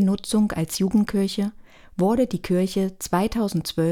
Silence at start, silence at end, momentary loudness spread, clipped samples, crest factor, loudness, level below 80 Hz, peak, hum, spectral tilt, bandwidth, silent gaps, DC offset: 0 s; 0 s; 5 LU; under 0.1%; 16 dB; -23 LUFS; -46 dBFS; -8 dBFS; none; -6 dB/octave; 17 kHz; none; under 0.1%